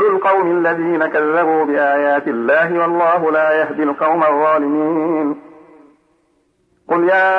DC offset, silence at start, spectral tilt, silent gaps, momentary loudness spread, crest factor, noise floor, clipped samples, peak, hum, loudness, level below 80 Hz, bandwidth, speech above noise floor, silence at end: under 0.1%; 0 s; -8 dB/octave; none; 4 LU; 12 dB; -61 dBFS; under 0.1%; -4 dBFS; none; -15 LUFS; -68 dBFS; 5.4 kHz; 46 dB; 0 s